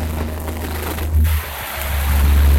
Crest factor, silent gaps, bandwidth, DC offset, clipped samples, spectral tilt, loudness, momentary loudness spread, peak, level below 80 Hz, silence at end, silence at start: 12 dB; none; 16.5 kHz; under 0.1%; under 0.1%; -5.5 dB/octave; -20 LUFS; 9 LU; -4 dBFS; -20 dBFS; 0 s; 0 s